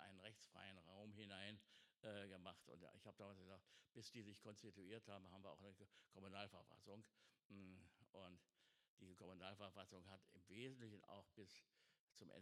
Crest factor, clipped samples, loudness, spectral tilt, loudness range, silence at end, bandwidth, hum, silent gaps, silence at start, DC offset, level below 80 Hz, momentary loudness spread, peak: 26 dB; under 0.1%; -62 LUFS; -4.5 dB/octave; 3 LU; 0 s; 13 kHz; none; 7.45-7.50 s, 8.88-8.97 s, 11.99-12.08 s; 0 s; under 0.1%; under -90 dBFS; 10 LU; -38 dBFS